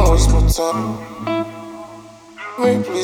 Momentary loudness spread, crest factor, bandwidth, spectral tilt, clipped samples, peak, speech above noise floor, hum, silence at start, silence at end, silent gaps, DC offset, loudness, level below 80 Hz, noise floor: 21 LU; 16 dB; 15.5 kHz; -5.5 dB/octave; under 0.1%; 0 dBFS; 20 dB; none; 0 s; 0 s; none; under 0.1%; -19 LUFS; -20 dBFS; -39 dBFS